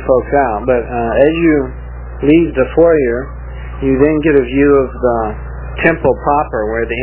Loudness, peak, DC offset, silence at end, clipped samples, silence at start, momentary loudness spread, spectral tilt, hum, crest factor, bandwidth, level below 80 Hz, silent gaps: -13 LUFS; 0 dBFS; under 0.1%; 0 s; under 0.1%; 0 s; 14 LU; -11 dB/octave; 60 Hz at -25 dBFS; 12 dB; 4 kHz; -26 dBFS; none